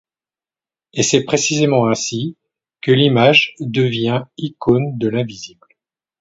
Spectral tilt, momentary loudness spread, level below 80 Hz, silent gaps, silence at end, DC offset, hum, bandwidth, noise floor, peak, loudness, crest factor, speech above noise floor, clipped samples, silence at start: -4.5 dB/octave; 15 LU; -54 dBFS; none; 0.75 s; under 0.1%; none; 8 kHz; under -90 dBFS; 0 dBFS; -16 LUFS; 18 dB; over 74 dB; under 0.1%; 0.95 s